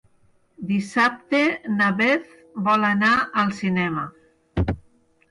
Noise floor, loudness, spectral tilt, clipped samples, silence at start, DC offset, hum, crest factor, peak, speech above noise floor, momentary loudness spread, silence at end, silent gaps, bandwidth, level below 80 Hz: -60 dBFS; -21 LUFS; -6 dB/octave; under 0.1%; 0.6 s; under 0.1%; none; 14 dB; -8 dBFS; 38 dB; 13 LU; 0.5 s; none; 11 kHz; -42 dBFS